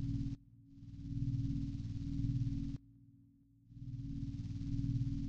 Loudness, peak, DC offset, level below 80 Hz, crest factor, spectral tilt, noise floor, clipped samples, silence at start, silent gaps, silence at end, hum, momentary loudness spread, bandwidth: -42 LUFS; -24 dBFS; under 0.1%; -50 dBFS; 16 dB; -9 dB/octave; -66 dBFS; under 0.1%; 0 s; none; 0 s; none; 14 LU; 7.4 kHz